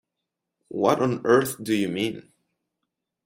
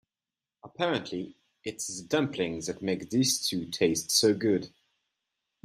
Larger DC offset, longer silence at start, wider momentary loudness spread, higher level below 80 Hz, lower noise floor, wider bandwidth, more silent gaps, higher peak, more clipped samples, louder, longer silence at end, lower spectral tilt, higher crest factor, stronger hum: neither; about the same, 0.7 s vs 0.65 s; second, 11 LU vs 14 LU; about the same, -64 dBFS vs -68 dBFS; second, -83 dBFS vs under -90 dBFS; about the same, 16 kHz vs 15.5 kHz; neither; first, -4 dBFS vs -10 dBFS; neither; first, -23 LUFS vs -28 LUFS; about the same, 1.05 s vs 0.95 s; first, -5.5 dB/octave vs -3.5 dB/octave; about the same, 22 dB vs 20 dB; neither